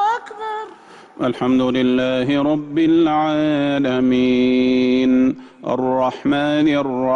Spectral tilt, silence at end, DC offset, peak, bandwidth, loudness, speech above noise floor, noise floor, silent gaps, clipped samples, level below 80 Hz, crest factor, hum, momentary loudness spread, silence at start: -7 dB/octave; 0 s; under 0.1%; -8 dBFS; 7.2 kHz; -17 LUFS; 25 dB; -42 dBFS; none; under 0.1%; -52 dBFS; 10 dB; none; 9 LU; 0 s